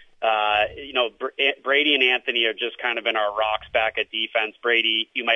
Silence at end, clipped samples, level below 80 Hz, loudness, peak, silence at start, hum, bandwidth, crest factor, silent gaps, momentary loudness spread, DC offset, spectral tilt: 0 s; under 0.1%; -58 dBFS; -21 LUFS; -6 dBFS; 0.2 s; none; 6.4 kHz; 18 dB; none; 6 LU; under 0.1%; -3.5 dB/octave